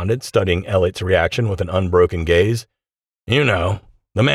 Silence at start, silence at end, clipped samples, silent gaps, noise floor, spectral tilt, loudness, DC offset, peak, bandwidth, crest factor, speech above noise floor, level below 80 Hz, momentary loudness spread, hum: 0 s; 0 s; under 0.1%; none; under -90 dBFS; -6 dB/octave; -18 LUFS; under 0.1%; -4 dBFS; 14 kHz; 14 dB; over 73 dB; -38 dBFS; 6 LU; none